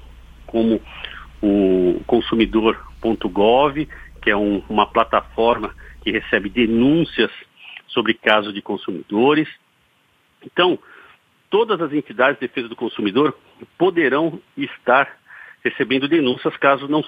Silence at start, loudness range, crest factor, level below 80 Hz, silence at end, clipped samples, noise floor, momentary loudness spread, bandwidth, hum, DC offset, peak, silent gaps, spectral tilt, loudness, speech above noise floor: 0.05 s; 3 LU; 20 dB; -44 dBFS; 0 s; under 0.1%; -60 dBFS; 11 LU; 5 kHz; none; under 0.1%; 0 dBFS; none; -7.5 dB/octave; -19 LUFS; 42 dB